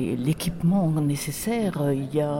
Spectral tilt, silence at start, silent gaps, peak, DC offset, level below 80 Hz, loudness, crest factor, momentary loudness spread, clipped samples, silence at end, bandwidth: -6.5 dB/octave; 0 s; none; -12 dBFS; under 0.1%; -48 dBFS; -25 LUFS; 12 dB; 4 LU; under 0.1%; 0 s; 17 kHz